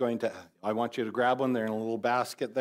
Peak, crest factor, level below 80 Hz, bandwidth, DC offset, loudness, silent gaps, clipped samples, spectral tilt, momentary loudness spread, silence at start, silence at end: -14 dBFS; 14 dB; -82 dBFS; 16 kHz; under 0.1%; -30 LUFS; none; under 0.1%; -5.5 dB/octave; 7 LU; 0 s; 0 s